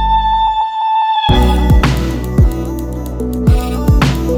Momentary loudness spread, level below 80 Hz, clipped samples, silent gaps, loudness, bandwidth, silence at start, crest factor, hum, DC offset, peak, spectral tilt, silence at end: 9 LU; -16 dBFS; under 0.1%; none; -14 LUFS; 16.5 kHz; 0 s; 10 dB; none; under 0.1%; -2 dBFS; -6.5 dB/octave; 0 s